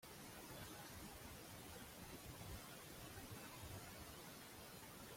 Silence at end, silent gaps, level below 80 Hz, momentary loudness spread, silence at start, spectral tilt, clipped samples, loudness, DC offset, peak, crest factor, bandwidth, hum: 0 s; none; -68 dBFS; 2 LU; 0 s; -3.5 dB/octave; under 0.1%; -55 LUFS; under 0.1%; -42 dBFS; 14 dB; 16.5 kHz; none